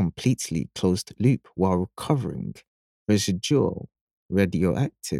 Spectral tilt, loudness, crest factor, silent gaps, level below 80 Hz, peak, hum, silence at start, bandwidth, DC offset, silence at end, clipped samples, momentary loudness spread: -6 dB/octave; -25 LUFS; 18 dB; 2.68-3.06 s, 4.01-4.29 s; -52 dBFS; -6 dBFS; none; 0 s; 15.5 kHz; under 0.1%; 0 s; under 0.1%; 8 LU